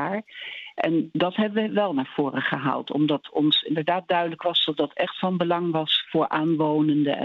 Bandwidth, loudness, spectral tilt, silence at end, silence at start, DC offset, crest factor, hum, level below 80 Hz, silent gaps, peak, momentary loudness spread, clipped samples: 5.6 kHz; -24 LUFS; -7.5 dB/octave; 0 s; 0 s; under 0.1%; 16 dB; none; -74 dBFS; none; -8 dBFS; 5 LU; under 0.1%